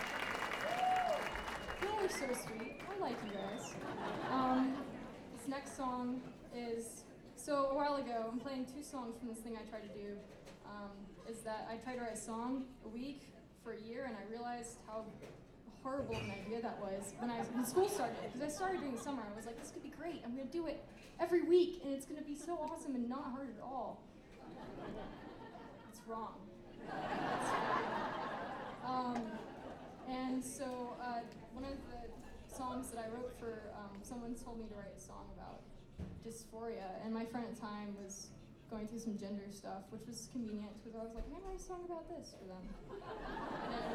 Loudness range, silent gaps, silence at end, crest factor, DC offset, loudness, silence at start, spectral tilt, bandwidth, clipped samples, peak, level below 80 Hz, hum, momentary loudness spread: 9 LU; none; 0 s; 22 dB; under 0.1%; -43 LUFS; 0 s; -4.5 dB/octave; 16 kHz; under 0.1%; -22 dBFS; -62 dBFS; none; 15 LU